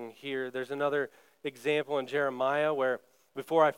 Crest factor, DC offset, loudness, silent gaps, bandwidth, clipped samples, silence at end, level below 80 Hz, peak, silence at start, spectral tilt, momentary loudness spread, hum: 20 dB; under 0.1%; -31 LUFS; none; 16.5 kHz; under 0.1%; 0.05 s; -90 dBFS; -12 dBFS; 0 s; -5.5 dB/octave; 12 LU; none